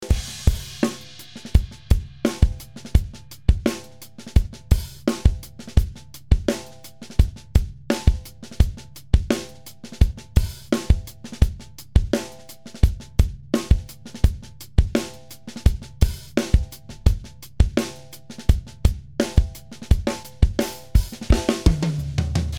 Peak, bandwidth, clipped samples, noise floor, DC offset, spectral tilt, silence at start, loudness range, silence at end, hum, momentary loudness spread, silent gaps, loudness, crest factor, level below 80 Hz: 0 dBFS; 16.5 kHz; under 0.1%; -42 dBFS; under 0.1%; -6 dB/octave; 0 s; 1 LU; 0 s; none; 16 LU; none; -24 LUFS; 22 dB; -24 dBFS